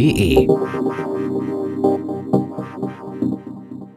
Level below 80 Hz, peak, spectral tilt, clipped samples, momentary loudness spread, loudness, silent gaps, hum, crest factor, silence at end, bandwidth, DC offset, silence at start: -38 dBFS; 0 dBFS; -7 dB/octave; under 0.1%; 13 LU; -20 LUFS; none; none; 18 dB; 0.05 s; 14.5 kHz; under 0.1%; 0 s